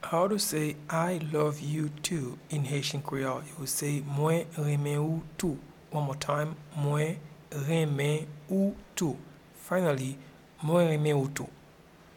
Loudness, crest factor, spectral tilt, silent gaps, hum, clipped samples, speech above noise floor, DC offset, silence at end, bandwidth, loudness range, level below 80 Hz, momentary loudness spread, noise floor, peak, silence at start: -31 LUFS; 16 dB; -5.5 dB/octave; none; none; under 0.1%; 25 dB; under 0.1%; 0.6 s; 17 kHz; 2 LU; -62 dBFS; 9 LU; -55 dBFS; -14 dBFS; 0 s